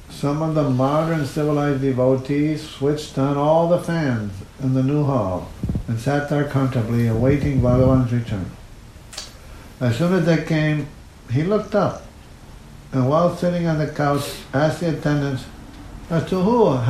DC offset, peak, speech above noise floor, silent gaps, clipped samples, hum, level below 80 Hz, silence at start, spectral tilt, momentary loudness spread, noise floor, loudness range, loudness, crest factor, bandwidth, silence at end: under 0.1%; -4 dBFS; 22 dB; none; under 0.1%; none; -40 dBFS; 0 s; -7.5 dB/octave; 10 LU; -41 dBFS; 2 LU; -20 LUFS; 16 dB; 14 kHz; 0 s